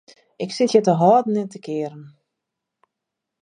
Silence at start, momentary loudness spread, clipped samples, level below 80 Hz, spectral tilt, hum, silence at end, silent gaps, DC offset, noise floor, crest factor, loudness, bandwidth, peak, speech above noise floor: 0.4 s; 15 LU; under 0.1%; -74 dBFS; -6.5 dB/octave; none; 1.35 s; none; under 0.1%; -83 dBFS; 20 dB; -19 LUFS; 10 kHz; -2 dBFS; 64 dB